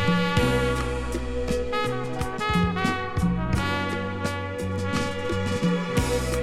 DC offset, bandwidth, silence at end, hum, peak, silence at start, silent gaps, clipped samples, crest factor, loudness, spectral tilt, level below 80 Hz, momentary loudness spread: under 0.1%; 15 kHz; 0 s; none; -10 dBFS; 0 s; none; under 0.1%; 16 dB; -26 LUFS; -5.5 dB/octave; -36 dBFS; 7 LU